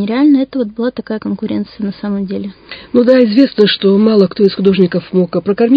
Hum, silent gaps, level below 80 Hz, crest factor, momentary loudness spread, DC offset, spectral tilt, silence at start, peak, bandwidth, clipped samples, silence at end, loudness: none; none; -50 dBFS; 12 dB; 12 LU; under 0.1%; -9 dB/octave; 0 s; 0 dBFS; 5.2 kHz; 0.2%; 0 s; -13 LUFS